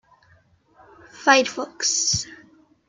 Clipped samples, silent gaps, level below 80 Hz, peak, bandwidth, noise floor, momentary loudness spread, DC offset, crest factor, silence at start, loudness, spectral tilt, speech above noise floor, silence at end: under 0.1%; none; -58 dBFS; -2 dBFS; 11 kHz; -58 dBFS; 10 LU; under 0.1%; 22 dB; 1.15 s; -20 LUFS; -1.5 dB/octave; 38 dB; 0.55 s